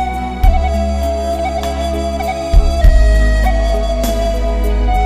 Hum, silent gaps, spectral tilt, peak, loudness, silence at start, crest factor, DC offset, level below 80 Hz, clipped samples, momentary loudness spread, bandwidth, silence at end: none; none; -6 dB/octave; 0 dBFS; -16 LUFS; 0 s; 12 dB; 0.3%; -14 dBFS; 0.3%; 6 LU; 15 kHz; 0 s